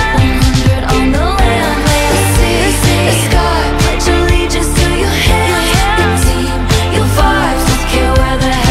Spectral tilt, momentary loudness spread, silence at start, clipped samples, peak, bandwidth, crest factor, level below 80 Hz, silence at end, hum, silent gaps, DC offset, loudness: -4.5 dB/octave; 2 LU; 0 s; under 0.1%; 0 dBFS; 16.5 kHz; 10 dB; -16 dBFS; 0 s; none; none; under 0.1%; -11 LUFS